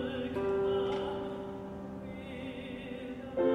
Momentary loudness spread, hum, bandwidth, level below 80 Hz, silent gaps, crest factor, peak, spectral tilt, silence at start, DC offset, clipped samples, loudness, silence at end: 11 LU; none; 9.8 kHz; -58 dBFS; none; 16 dB; -18 dBFS; -7.5 dB/octave; 0 s; under 0.1%; under 0.1%; -37 LUFS; 0 s